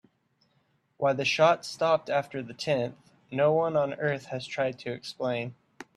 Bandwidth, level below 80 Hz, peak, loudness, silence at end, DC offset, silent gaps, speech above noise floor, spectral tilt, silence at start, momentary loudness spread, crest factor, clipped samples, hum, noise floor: 12.5 kHz; -72 dBFS; -8 dBFS; -28 LUFS; 0.15 s; under 0.1%; none; 43 dB; -5 dB/octave; 1 s; 13 LU; 20 dB; under 0.1%; none; -71 dBFS